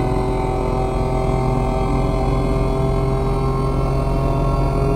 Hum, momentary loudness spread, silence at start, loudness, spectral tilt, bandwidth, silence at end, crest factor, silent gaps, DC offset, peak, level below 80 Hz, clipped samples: none; 1 LU; 0 s; -20 LUFS; -8 dB/octave; 11 kHz; 0 s; 14 dB; none; 0.4%; -4 dBFS; -22 dBFS; under 0.1%